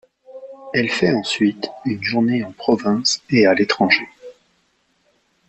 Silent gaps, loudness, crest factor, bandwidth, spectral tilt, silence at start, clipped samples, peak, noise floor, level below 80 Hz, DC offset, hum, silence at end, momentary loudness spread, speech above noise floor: none; -18 LUFS; 20 dB; 8.6 kHz; -4.5 dB/octave; 0.3 s; under 0.1%; 0 dBFS; -64 dBFS; -58 dBFS; under 0.1%; none; 1.15 s; 12 LU; 46 dB